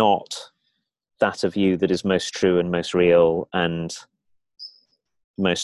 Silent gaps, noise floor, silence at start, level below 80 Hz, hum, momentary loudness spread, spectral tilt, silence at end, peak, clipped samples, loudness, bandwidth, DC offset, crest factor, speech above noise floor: 5.24-5.34 s; -74 dBFS; 0 s; -52 dBFS; none; 22 LU; -5 dB/octave; 0 s; -4 dBFS; under 0.1%; -21 LUFS; 12 kHz; under 0.1%; 18 dB; 53 dB